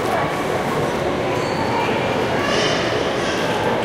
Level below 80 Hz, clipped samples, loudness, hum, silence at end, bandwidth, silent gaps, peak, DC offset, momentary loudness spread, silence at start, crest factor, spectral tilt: -44 dBFS; under 0.1%; -20 LUFS; none; 0 s; 16.5 kHz; none; -6 dBFS; under 0.1%; 3 LU; 0 s; 14 dB; -4.5 dB/octave